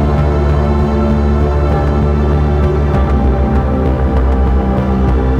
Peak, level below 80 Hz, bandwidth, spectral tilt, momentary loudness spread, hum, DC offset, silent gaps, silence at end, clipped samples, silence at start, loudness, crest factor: -2 dBFS; -14 dBFS; 6 kHz; -9.5 dB/octave; 1 LU; none; under 0.1%; none; 0 s; under 0.1%; 0 s; -13 LUFS; 10 dB